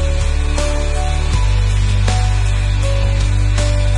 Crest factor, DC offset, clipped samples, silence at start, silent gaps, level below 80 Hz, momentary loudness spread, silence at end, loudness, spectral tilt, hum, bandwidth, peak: 10 dB; under 0.1%; under 0.1%; 0 s; none; -16 dBFS; 3 LU; 0 s; -17 LUFS; -5 dB/octave; none; 11 kHz; -2 dBFS